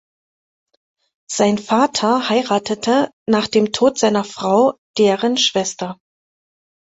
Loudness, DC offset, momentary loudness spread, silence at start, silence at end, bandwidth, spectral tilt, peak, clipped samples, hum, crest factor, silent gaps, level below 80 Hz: -17 LUFS; under 0.1%; 5 LU; 1.3 s; 0.9 s; 8.2 kHz; -4 dB/octave; -2 dBFS; under 0.1%; none; 16 dB; 3.13-3.26 s, 4.78-4.94 s; -60 dBFS